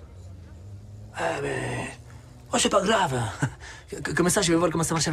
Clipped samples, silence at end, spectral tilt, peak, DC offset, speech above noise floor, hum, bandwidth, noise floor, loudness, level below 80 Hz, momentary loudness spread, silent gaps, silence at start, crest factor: under 0.1%; 0 s; -4 dB/octave; -8 dBFS; under 0.1%; 20 dB; none; 15.5 kHz; -45 dBFS; -25 LUFS; -48 dBFS; 23 LU; none; 0 s; 18 dB